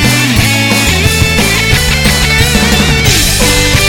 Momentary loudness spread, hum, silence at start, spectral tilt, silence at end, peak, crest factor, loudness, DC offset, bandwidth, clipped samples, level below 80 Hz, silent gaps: 1 LU; none; 0 s; -3 dB/octave; 0 s; 0 dBFS; 8 dB; -8 LUFS; under 0.1%; 18 kHz; 0.3%; -18 dBFS; none